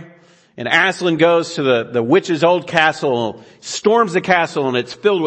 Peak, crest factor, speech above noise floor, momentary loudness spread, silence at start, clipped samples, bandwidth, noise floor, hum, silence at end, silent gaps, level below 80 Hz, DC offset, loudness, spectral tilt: 0 dBFS; 16 dB; 32 dB; 7 LU; 0 s; under 0.1%; 8.8 kHz; -48 dBFS; none; 0 s; none; -64 dBFS; under 0.1%; -16 LUFS; -4.5 dB/octave